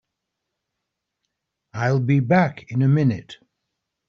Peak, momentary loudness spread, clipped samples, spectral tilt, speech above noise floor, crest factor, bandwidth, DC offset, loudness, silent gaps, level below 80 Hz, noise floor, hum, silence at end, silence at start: -4 dBFS; 10 LU; under 0.1%; -7.5 dB/octave; 62 dB; 18 dB; 6.8 kHz; under 0.1%; -20 LUFS; none; -62 dBFS; -81 dBFS; none; 0.75 s; 1.75 s